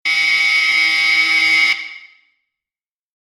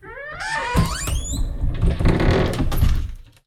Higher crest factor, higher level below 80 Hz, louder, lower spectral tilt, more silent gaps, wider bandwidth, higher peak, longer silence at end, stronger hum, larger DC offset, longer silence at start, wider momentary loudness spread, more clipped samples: about the same, 14 dB vs 16 dB; second, -66 dBFS vs -22 dBFS; first, -12 LUFS vs -22 LUFS; second, 1.5 dB/octave vs -5.5 dB/octave; neither; second, 14.5 kHz vs 16 kHz; about the same, -4 dBFS vs -4 dBFS; first, 1.3 s vs 0.25 s; neither; neither; about the same, 0.05 s vs 0.05 s; second, 5 LU vs 9 LU; neither